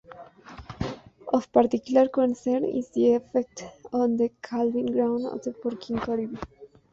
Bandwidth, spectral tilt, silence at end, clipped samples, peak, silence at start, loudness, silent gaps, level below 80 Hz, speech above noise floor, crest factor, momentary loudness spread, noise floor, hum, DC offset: 7.8 kHz; -6.5 dB/octave; 0.25 s; under 0.1%; -6 dBFS; 0.1 s; -26 LUFS; none; -56 dBFS; 22 dB; 20 dB; 18 LU; -46 dBFS; none; under 0.1%